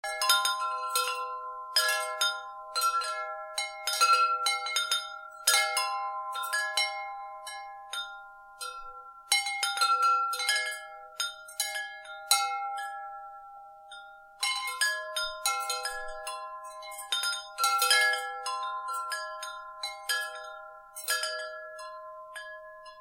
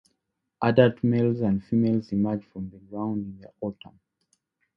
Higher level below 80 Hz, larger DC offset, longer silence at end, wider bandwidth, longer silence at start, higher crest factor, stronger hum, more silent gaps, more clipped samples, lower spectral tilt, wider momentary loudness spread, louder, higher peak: second, -66 dBFS vs -58 dBFS; neither; second, 0 s vs 1.05 s; first, 16 kHz vs 5.8 kHz; second, 0.05 s vs 0.6 s; about the same, 26 dB vs 22 dB; neither; neither; neither; second, 4.5 dB/octave vs -10 dB/octave; about the same, 19 LU vs 18 LU; second, -29 LUFS vs -25 LUFS; about the same, -6 dBFS vs -4 dBFS